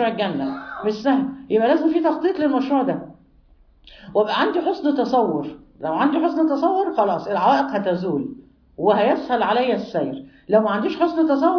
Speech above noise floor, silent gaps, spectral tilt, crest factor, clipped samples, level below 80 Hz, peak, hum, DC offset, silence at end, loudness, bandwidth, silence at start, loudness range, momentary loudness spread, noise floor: 33 dB; none; -7 dB/octave; 16 dB; under 0.1%; -58 dBFS; -4 dBFS; none; under 0.1%; 0 s; -20 LUFS; 5.4 kHz; 0 s; 2 LU; 9 LU; -53 dBFS